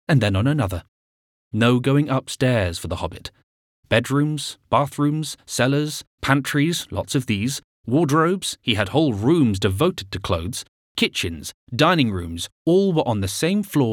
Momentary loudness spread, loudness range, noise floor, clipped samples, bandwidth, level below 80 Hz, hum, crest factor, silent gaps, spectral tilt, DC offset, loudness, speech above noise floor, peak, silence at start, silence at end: 11 LU; 2 LU; under -90 dBFS; under 0.1%; 17.5 kHz; -50 dBFS; none; 20 dB; 0.88-1.51 s, 3.43-3.83 s, 6.07-6.18 s, 7.64-7.84 s, 10.68-10.95 s, 11.54-11.67 s, 12.52-12.65 s; -5.5 dB/octave; under 0.1%; -21 LUFS; over 69 dB; -2 dBFS; 0.1 s; 0 s